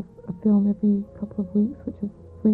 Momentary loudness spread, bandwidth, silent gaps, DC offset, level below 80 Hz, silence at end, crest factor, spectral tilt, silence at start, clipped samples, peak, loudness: 14 LU; 1.8 kHz; none; under 0.1%; -52 dBFS; 0 s; 14 dB; -13 dB/octave; 0 s; under 0.1%; -10 dBFS; -24 LUFS